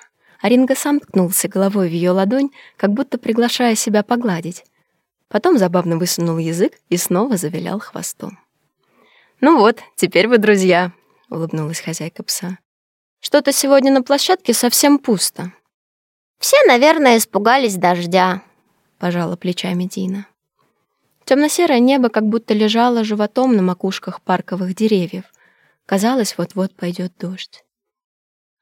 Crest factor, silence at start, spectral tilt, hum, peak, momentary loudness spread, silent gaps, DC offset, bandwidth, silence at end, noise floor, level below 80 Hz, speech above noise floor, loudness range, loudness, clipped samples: 16 dB; 0.45 s; -4.5 dB/octave; none; 0 dBFS; 13 LU; 12.65-13.17 s, 15.74-16.35 s; under 0.1%; 17 kHz; 1.15 s; -69 dBFS; -72 dBFS; 53 dB; 6 LU; -16 LUFS; under 0.1%